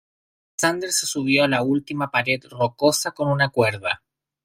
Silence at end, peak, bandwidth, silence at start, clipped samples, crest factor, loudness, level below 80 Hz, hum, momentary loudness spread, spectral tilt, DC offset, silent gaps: 0.5 s; -4 dBFS; 16 kHz; 0.6 s; under 0.1%; 18 dB; -21 LUFS; -62 dBFS; none; 7 LU; -3.5 dB/octave; under 0.1%; none